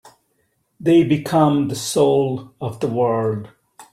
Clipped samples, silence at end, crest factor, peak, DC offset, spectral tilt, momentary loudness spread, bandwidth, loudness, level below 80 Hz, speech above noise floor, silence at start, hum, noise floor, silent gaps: under 0.1%; 0.1 s; 16 dB; -4 dBFS; under 0.1%; -6.5 dB/octave; 10 LU; 15 kHz; -18 LUFS; -58 dBFS; 49 dB; 0.05 s; none; -67 dBFS; none